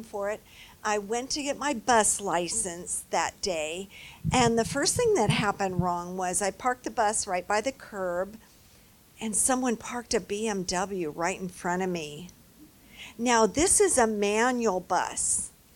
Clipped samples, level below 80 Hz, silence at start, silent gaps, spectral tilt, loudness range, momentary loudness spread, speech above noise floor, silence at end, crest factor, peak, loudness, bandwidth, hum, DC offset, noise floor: under 0.1%; -54 dBFS; 0 s; none; -3 dB/octave; 5 LU; 12 LU; 29 dB; 0.25 s; 20 dB; -8 dBFS; -27 LUFS; 18 kHz; none; under 0.1%; -57 dBFS